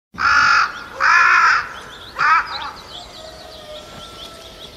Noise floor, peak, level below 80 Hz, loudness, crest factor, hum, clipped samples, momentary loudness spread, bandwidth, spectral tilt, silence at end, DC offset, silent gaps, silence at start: -37 dBFS; -2 dBFS; -48 dBFS; -14 LUFS; 16 dB; none; under 0.1%; 24 LU; 14.5 kHz; -1 dB/octave; 0 s; under 0.1%; none; 0.15 s